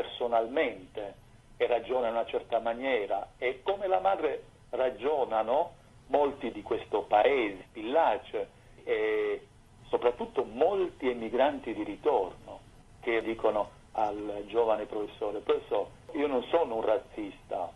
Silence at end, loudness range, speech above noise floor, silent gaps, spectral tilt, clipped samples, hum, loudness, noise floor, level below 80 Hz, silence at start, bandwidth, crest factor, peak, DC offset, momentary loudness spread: 0.05 s; 2 LU; 22 dB; none; -6 dB/octave; under 0.1%; none; -31 LUFS; -52 dBFS; -60 dBFS; 0 s; 12 kHz; 18 dB; -12 dBFS; under 0.1%; 11 LU